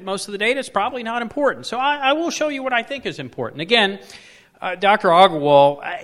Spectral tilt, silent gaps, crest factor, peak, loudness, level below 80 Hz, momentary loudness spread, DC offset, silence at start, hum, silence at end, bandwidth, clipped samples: -4 dB/octave; none; 18 dB; 0 dBFS; -18 LUFS; -62 dBFS; 15 LU; under 0.1%; 0 s; none; 0 s; 13 kHz; under 0.1%